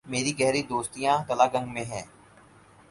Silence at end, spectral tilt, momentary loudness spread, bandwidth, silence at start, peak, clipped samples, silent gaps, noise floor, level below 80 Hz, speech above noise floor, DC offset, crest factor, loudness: 0.85 s; -4 dB/octave; 12 LU; 11.5 kHz; 0.05 s; -6 dBFS; under 0.1%; none; -55 dBFS; -60 dBFS; 28 dB; under 0.1%; 22 dB; -26 LUFS